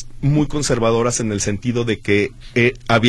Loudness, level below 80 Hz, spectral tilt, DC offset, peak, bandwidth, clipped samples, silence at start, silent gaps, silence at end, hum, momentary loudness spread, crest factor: -18 LUFS; -36 dBFS; -5 dB/octave; under 0.1%; 0 dBFS; 12.5 kHz; under 0.1%; 0 s; none; 0 s; none; 4 LU; 18 dB